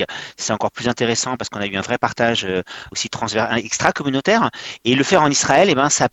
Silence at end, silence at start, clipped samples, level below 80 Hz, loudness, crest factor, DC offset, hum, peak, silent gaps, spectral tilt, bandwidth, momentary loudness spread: 0.05 s; 0 s; under 0.1%; -52 dBFS; -18 LUFS; 18 dB; under 0.1%; none; 0 dBFS; none; -3 dB/octave; 10.5 kHz; 10 LU